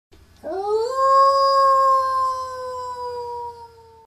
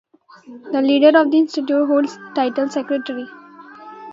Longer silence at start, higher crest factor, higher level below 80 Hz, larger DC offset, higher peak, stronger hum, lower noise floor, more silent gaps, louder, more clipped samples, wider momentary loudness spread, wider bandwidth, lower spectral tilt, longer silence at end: about the same, 0.45 s vs 0.5 s; about the same, 14 dB vs 18 dB; first, -58 dBFS vs -74 dBFS; neither; second, -8 dBFS vs 0 dBFS; neither; first, -44 dBFS vs -39 dBFS; neither; about the same, -19 LUFS vs -17 LUFS; neither; about the same, 16 LU vs 18 LU; first, 14 kHz vs 7.8 kHz; second, -3 dB/octave vs -4.5 dB/octave; first, 0.4 s vs 0 s